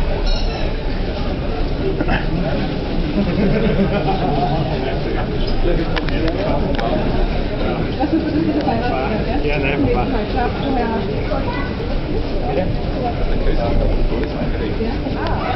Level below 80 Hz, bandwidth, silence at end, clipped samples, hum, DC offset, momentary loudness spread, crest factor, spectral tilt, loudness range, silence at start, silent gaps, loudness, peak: -22 dBFS; 6 kHz; 0 s; under 0.1%; none; under 0.1%; 5 LU; 14 dB; -8 dB/octave; 2 LU; 0 s; none; -20 LUFS; -2 dBFS